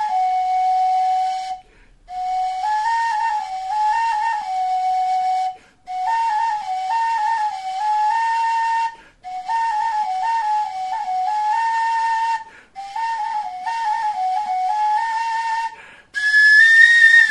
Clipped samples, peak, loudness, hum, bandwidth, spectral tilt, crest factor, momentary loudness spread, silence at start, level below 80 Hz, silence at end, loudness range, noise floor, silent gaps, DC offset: under 0.1%; 0 dBFS; -18 LUFS; none; 11.5 kHz; 1.5 dB/octave; 18 dB; 13 LU; 0 s; -60 dBFS; 0 s; 5 LU; -49 dBFS; none; 0.1%